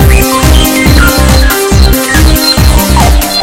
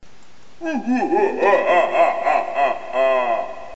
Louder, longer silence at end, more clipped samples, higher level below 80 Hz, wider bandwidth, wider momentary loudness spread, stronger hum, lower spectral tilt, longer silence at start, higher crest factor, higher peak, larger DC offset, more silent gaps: first, -6 LUFS vs -19 LUFS; about the same, 0 s vs 0 s; first, 7% vs under 0.1%; first, -8 dBFS vs -60 dBFS; first, 17 kHz vs 8 kHz; second, 1 LU vs 9 LU; neither; about the same, -4 dB/octave vs -5 dB/octave; about the same, 0 s vs 0 s; second, 6 dB vs 16 dB; first, 0 dBFS vs -4 dBFS; second, under 0.1% vs 2%; neither